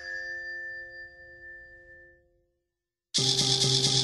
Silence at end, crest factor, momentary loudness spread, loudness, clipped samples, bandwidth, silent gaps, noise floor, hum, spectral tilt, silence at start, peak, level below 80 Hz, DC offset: 0 s; 22 dB; 24 LU; -25 LUFS; under 0.1%; 13.5 kHz; none; -87 dBFS; none; -2 dB/octave; 0 s; -10 dBFS; -62 dBFS; under 0.1%